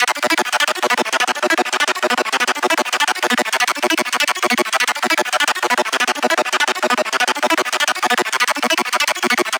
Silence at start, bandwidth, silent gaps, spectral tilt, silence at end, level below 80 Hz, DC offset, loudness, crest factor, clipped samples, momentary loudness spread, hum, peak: 0 s; over 20 kHz; none; 0 dB/octave; 0 s; -72 dBFS; under 0.1%; -16 LUFS; 12 dB; under 0.1%; 1 LU; none; -4 dBFS